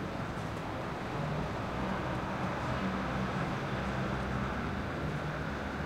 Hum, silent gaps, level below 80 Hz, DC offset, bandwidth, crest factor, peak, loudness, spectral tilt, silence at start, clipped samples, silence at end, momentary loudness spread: none; none; -46 dBFS; under 0.1%; 16 kHz; 14 dB; -22 dBFS; -36 LUFS; -6.5 dB/octave; 0 s; under 0.1%; 0 s; 4 LU